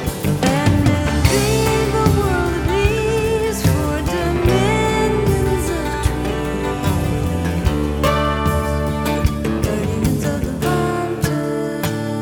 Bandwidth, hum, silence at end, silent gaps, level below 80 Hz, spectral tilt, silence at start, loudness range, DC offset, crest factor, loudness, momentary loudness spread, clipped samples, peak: 19 kHz; none; 0 s; none; -26 dBFS; -6 dB/octave; 0 s; 3 LU; under 0.1%; 16 dB; -18 LUFS; 5 LU; under 0.1%; -2 dBFS